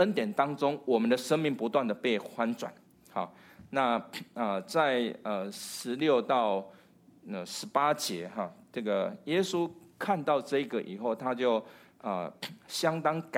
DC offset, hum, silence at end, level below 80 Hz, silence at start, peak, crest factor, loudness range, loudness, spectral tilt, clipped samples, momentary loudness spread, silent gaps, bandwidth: under 0.1%; none; 0 s; -80 dBFS; 0 s; -12 dBFS; 20 dB; 2 LU; -31 LUFS; -4.5 dB/octave; under 0.1%; 11 LU; none; 16.5 kHz